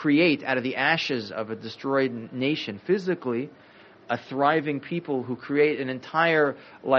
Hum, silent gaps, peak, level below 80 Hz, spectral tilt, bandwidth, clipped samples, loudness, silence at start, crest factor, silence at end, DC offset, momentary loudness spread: none; none; -6 dBFS; -72 dBFS; -3.5 dB/octave; 6.8 kHz; under 0.1%; -25 LUFS; 0 s; 20 dB; 0 s; under 0.1%; 11 LU